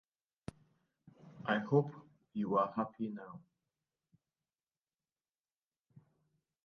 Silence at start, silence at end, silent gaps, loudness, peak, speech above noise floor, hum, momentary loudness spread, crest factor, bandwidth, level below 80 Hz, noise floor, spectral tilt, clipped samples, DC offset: 1.25 s; 3.25 s; none; -36 LUFS; -18 dBFS; over 55 dB; none; 21 LU; 24 dB; 7 kHz; -76 dBFS; under -90 dBFS; -6 dB/octave; under 0.1%; under 0.1%